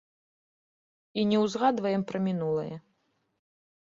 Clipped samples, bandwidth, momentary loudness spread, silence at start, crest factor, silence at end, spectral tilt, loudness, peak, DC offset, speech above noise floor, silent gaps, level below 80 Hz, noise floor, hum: under 0.1%; 7.6 kHz; 12 LU; 1.15 s; 20 dB; 1 s; -6.5 dB/octave; -28 LUFS; -12 dBFS; under 0.1%; 47 dB; none; -72 dBFS; -74 dBFS; none